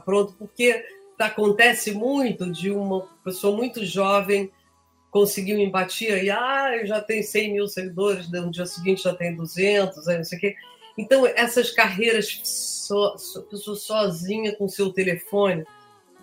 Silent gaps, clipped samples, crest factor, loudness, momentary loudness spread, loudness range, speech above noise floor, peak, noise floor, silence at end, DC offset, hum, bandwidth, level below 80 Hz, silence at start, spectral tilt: none; under 0.1%; 22 dB; -23 LUFS; 10 LU; 3 LU; 39 dB; -2 dBFS; -62 dBFS; 0.55 s; under 0.1%; none; 16 kHz; -70 dBFS; 0.05 s; -4 dB/octave